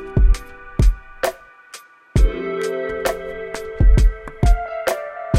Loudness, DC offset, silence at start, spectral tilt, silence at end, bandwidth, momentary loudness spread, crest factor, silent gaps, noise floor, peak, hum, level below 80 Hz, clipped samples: -21 LUFS; under 0.1%; 0 s; -6 dB/octave; 0 s; 15 kHz; 13 LU; 16 dB; none; -43 dBFS; -2 dBFS; none; -20 dBFS; under 0.1%